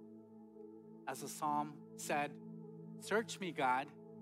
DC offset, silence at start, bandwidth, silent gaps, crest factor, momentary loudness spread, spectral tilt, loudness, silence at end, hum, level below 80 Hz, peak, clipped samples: under 0.1%; 0 s; 16 kHz; none; 18 dB; 20 LU; -4 dB/octave; -40 LUFS; 0 s; none; under -90 dBFS; -24 dBFS; under 0.1%